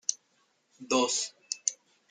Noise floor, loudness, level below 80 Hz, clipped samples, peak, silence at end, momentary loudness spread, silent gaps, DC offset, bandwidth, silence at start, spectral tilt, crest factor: -71 dBFS; -30 LUFS; -84 dBFS; under 0.1%; -8 dBFS; 0.35 s; 8 LU; none; under 0.1%; 10.5 kHz; 0.1 s; -0.5 dB/octave; 26 dB